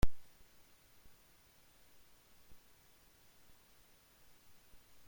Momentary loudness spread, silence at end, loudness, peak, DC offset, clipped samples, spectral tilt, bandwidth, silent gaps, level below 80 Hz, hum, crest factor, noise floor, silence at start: 0 LU; 4.85 s; -59 LUFS; -16 dBFS; under 0.1%; under 0.1%; -5.5 dB/octave; 16.5 kHz; none; -50 dBFS; none; 24 dB; -66 dBFS; 0.05 s